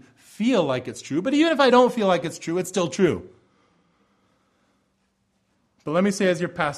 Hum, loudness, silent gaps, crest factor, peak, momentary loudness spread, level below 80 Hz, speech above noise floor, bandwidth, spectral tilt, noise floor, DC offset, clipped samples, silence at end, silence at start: none; -22 LUFS; none; 18 dB; -6 dBFS; 11 LU; -62 dBFS; 48 dB; 14 kHz; -5 dB/octave; -70 dBFS; under 0.1%; under 0.1%; 0 s; 0.4 s